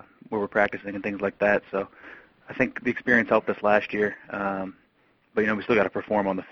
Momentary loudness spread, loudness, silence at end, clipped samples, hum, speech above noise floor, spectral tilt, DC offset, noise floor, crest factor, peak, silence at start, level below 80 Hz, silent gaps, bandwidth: 10 LU; -25 LUFS; 0.1 s; under 0.1%; none; 39 dB; -7 dB/octave; under 0.1%; -64 dBFS; 22 dB; -4 dBFS; 0.3 s; -58 dBFS; none; 6.8 kHz